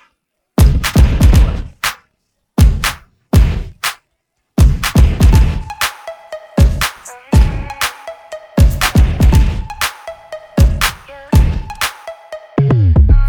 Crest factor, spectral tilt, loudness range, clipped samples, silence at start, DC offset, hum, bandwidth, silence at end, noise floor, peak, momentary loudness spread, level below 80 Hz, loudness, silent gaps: 12 dB; -5.5 dB/octave; 3 LU; under 0.1%; 0.6 s; under 0.1%; none; over 20 kHz; 0 s; -68 dBFS; 0 dBFS; 19 LU; -14 dBFS; -14 LUFS; none